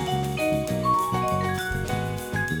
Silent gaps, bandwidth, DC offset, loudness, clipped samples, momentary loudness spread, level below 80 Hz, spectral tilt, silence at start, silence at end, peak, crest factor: none; over 20 kHz; under 0.1%; -26 LUFS; under 0.1%; 5 LU; -42 dBFS; -5.5 dB/octave; 0 s; 0 s; -12 dBFS; 14 dB